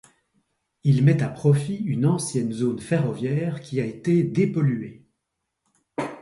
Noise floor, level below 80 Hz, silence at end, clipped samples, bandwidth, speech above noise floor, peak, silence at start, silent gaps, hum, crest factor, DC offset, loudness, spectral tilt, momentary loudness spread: -80 dBFS; -60 dBFS; 0 s; under 0.1%; 11.5 kHz; 58 dB; -6 dBFS; 0.85 s; none; none; 16 dB; under 0.1%; -23 LUFS; -7.5 dB/octave; 10 LU